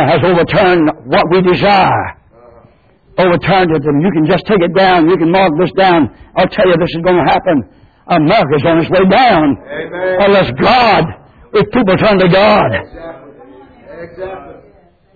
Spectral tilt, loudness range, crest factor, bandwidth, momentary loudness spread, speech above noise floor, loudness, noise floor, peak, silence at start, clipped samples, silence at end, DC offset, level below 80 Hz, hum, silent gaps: -8.5 dB/octave; 2 LU; 10 dB; 4.9 kHz; 13 LU; 37 dB; -10 LUFS; -46 dBFS; 0 dBFS; 0 s; under 0.1%; 0.65 s; under 0.1%; -38 dBFS; none; none